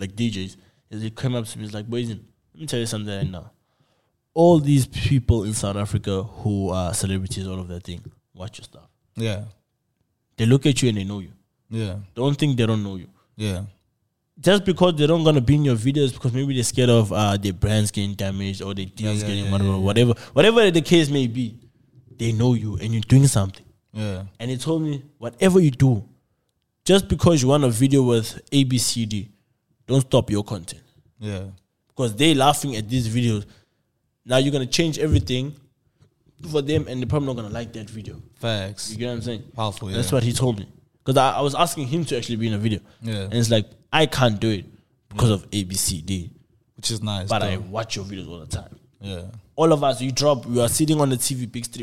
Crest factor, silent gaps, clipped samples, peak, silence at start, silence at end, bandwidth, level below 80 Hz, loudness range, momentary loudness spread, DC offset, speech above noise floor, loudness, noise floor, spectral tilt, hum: 18 dB; none; under 0.1%; -2 dBFS; 0 s; 0 s; 16 kHz; -44 dBFS; 8 LU; 16 LU; 0.4%; 51 dB; -21 LUFS; -72 dBFS; -5.5 dB/octave; none